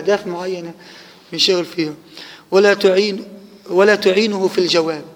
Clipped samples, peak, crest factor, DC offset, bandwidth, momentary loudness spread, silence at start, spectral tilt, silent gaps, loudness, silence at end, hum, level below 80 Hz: under 0.1%; 0 dBFS; 16 dB; under 0.1%; 16 kHz; 20 LU; 0 s; -4 dB/octave; none; -16 LUFS; 0.05 s; none; -66 dBFS